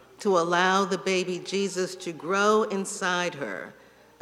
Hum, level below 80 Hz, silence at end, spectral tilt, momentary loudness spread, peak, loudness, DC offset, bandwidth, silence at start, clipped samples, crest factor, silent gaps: none; -74 dBFS; 0.5 s; -4 dB/octave; 13 LU; -8 dBFS; -26 LUFS; under 0.1%; 13.5 kHz; 0.2 s; under 0.1%; 20 dB; none